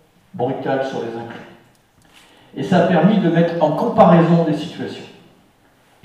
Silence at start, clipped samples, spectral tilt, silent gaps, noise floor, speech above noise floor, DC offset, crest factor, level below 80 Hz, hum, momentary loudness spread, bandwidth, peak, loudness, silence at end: 0.35 s; under 0.1%; -8.5 dB/octave; none; -54 dBFS; 38 dB; under 0.1%; 18 dB; -60 dBFS; none; 19 LU; 8.2 kHz; 0 dBFS; -16 LUFS; 0.95 s